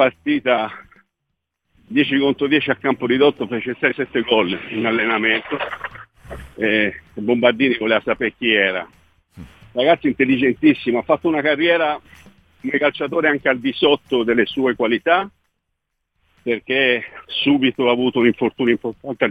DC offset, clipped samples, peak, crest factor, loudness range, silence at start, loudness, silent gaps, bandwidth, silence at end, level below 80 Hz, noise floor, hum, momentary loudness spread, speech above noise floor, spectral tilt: under 0.1%; under 0.1%; 0 dBFS; 18 dB; 2 LU; 0 s; -18 LUFS; none; 5 kHz; 0 s; -54 dBFS; -77 dBFS; none; 9 LU; 58 dB; -7 dB/octave